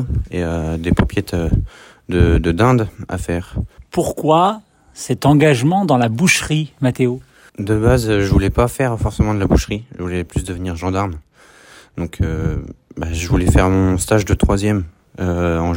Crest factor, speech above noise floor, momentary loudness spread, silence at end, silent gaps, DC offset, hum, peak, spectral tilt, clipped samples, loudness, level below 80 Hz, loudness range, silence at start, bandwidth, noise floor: 16 dB; 29 dB; 13 LU; 0 s; none; under 0.1%; none; 0 dBFS; -6 dB/octave; under 0.1%; -17 LUFS; -26 dBFS; 6 LU; 0 s; 16.5 kHz; -45 dBFS